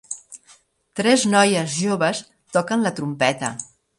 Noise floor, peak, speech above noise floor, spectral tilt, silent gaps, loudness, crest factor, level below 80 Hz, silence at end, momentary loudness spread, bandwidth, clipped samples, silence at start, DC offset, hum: -55 dBFS; -4 dBFS; 35 dB; -4 dB/octave; none; -20 LUFS; 18 dB; -66 dBFS; 0.35 s; 17 LU; 11.5 kHz; under 0.1%; 0.1 s; under 0.1%; none